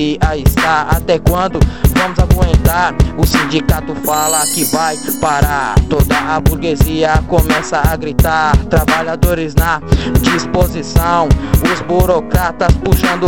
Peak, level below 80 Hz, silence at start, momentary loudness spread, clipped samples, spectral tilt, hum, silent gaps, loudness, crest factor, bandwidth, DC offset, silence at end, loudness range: 0 dBFS; -18 dBFS; 0 s; 3 LU; under 0.1%; -5 dB/octave; none; none; -13 LUFS; 12 dB; 17.5 kHz; 2%; 0 s; 1 LU